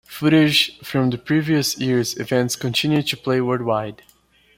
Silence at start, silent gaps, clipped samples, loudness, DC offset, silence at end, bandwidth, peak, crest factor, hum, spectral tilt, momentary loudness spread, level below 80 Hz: 0.1 s; none; under 0.1%; -19 LUFS; under 0.1%; 0.65 s; 16.5 kHz; -4 dBFS; 16 dB; none; -4.5 dB/octave; 6 LU; -56 dBFS